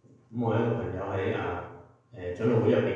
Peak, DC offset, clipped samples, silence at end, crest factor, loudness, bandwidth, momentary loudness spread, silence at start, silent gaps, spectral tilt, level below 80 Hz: -12 dBFS; under 0.1%; under 0.1%; 0 s; 16 dB; -29 LUFS; 7.2 kHz; 15 LU; 0.3 s; none; -9 dB/octave; -60 dBFS